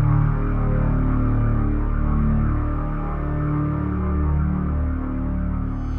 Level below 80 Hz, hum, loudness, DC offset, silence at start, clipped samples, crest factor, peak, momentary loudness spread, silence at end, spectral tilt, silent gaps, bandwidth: -24 dBFS; none; -23 LUFS; under 0.1%; 0 s; under 0.1%; 12 dB; -8 dBFS; 5 LU; 0 s; -11.5 dB/octave; none; 3.2 kHz